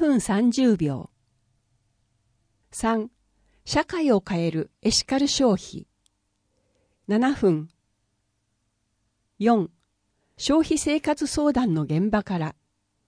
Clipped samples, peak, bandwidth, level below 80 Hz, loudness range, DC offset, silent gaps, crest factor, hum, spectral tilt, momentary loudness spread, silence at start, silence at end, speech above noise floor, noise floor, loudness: under 0.1%; -8 dBFS; 10.5 kHz; -50 dBFS; 5 LU; under 0.1%; none; 18 dB; none; -5 dB/octave; 13 LU; 0 s; 0.55 s; 51 dB; -74 dBFS; -23 LUFS